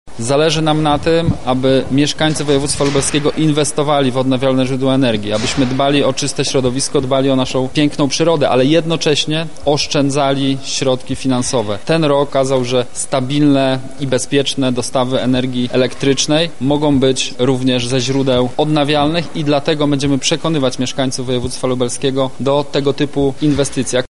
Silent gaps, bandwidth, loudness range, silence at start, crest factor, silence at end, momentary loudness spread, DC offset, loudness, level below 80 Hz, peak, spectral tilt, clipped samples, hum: none; 11.5 kHz; 2 LU; 0.05 s; 14 dB; 0 s; 4 LU; 5%; -15 LUFS; -40 dBFS; -2 dBFS; -5 dB/octave; under 0.1%; none